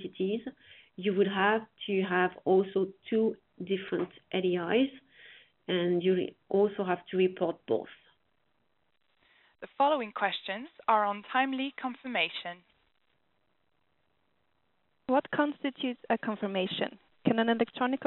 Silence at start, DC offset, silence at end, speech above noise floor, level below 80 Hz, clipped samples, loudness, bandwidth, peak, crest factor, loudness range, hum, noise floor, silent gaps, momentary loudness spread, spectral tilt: 0 s; under 0.1%; 0 s; 47 dB; -76 dBFS; under 0.1%; -30 LUFS; 4.2 kHz; -12 dBFS; 20 dB; 6 LU; none; -77 dBFS; none; 10 LU; -3.5 dB/octave